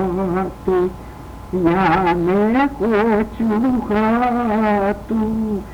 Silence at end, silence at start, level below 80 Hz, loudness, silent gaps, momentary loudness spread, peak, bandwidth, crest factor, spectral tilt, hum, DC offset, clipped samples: 0 s; 0 s; -38 dBFS; -18 LUFS; none; 6 LU; -2 dBFS; 17 kHz; 14 dB; -8 dB/octave; none; under 0.1%; under 0.1%